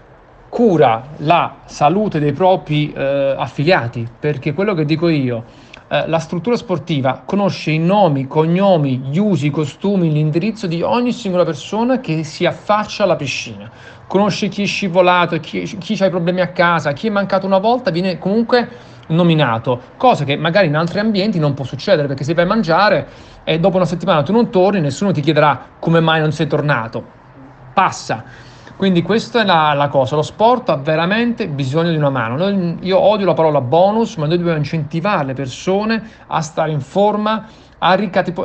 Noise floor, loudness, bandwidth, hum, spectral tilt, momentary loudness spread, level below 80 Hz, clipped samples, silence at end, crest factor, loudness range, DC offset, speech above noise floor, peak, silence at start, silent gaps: -43 dBFS; -16 LUFS; 8.6 kHz; none; -6.5 dB/octave; 8 LU; -50 dBFS; under 0.1%; 0 s; 16 dB; 3 LU; under 0.1%; 28 dB; 0 dBFS; 0.5 s; none